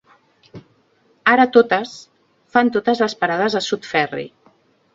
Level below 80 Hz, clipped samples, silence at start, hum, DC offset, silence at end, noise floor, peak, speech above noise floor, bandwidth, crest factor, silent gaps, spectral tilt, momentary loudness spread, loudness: -64 dBFS; under 0.1%; 0.55 s; none; under 0.1%; 0.65 s; -59 dBFS; 0 dBFS; 42 dB; 7.8 kHz; 20 dB; none; -4.5 dB/octave; 16 LU; -17 LUFS